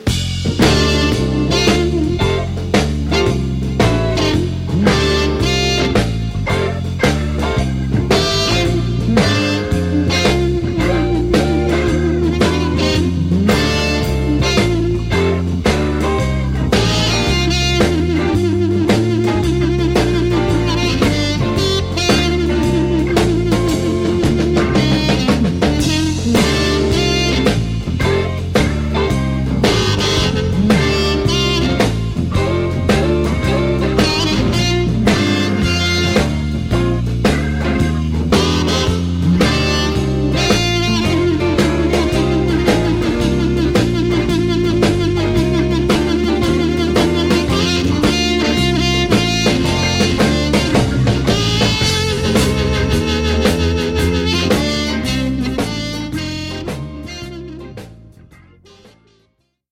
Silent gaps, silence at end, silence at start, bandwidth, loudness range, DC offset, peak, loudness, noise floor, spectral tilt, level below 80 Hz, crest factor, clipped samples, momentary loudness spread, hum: none; 1.65 s; 0 s; 16.5 kHz; 2 LU; under 0.1%; -2 dBFS; -15 LUFS; -62 dBFS; -5.5 dB/octave; -24 dBFS; 14 dB; under 0.1%; 4 LU; none